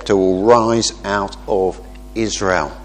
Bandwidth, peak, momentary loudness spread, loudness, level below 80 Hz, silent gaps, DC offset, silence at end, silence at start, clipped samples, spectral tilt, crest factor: 10 kHz; 0 dBFS; 10 LU; -17 LUFS; -36 dBFS; none; under 0.1%; 0 s; 0 s; under 0.1%; -4.5 dB/octave; 16 dB